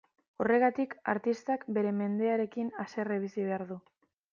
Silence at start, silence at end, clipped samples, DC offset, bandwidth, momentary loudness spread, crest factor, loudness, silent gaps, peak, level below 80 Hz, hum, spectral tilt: 0.4 s; 0.55 s; under 0.1%; under 0.1%; 7.2 kHz; 10 LU; 18 dB; -32 LUFS; none; -14 dBFS; -78 dBFS; none; -7.5 dB/octave